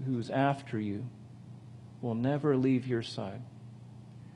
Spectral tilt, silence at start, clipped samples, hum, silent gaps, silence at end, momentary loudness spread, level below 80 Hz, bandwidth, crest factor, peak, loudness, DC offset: -8 dB/octave; 0 s; under 0.1%; none; none; 0 s; 22 LU; -72 dBFS; 10.5 kHz; 20 dB; -14 dBFS; -32 LUFS; under 0.1%